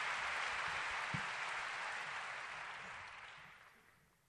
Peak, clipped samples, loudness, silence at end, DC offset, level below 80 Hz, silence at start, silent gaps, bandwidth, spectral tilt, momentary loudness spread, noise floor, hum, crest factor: -28 dBFS; under 0.1%; -42 LUFS; 0.4 s; under 0.1%; -74 dBFS; 0 s; none; 13 kHz; -2 dB/octave; 14 LU; -70 dBFS; none; 18 dB